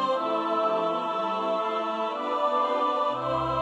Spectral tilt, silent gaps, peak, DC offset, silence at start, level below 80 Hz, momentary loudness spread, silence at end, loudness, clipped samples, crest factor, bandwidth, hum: -6 dB/octave; none; -14 dBFS; under 0.1%; 0 s; -58 dBFS; 3 LU; 0 s; -27 LUFS; under 0.1%; 12 dB; 9.8 kHz; none